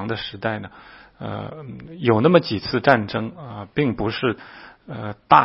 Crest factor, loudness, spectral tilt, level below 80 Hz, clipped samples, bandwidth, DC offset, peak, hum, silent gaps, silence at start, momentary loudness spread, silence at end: 22 dB; -21 LUFS; -9 dB/octave; -52 dBFS; under 0.1%; 5.8 kHz; under 0.1%; 0 dBFS; none; none; 0 s; 20 LU; 0 s